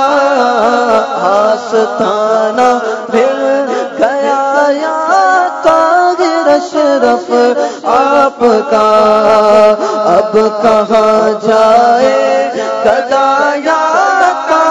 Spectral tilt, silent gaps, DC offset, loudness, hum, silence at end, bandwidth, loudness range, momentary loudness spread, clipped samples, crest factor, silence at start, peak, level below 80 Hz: -4 dB/octave; none; under 0.1%; -9 LUFS; none; 0 s; 9.8 kHz; 3 LU; 5 LU; 1%; 10 dB; 0 s; 0 dBFS; -50 dBFS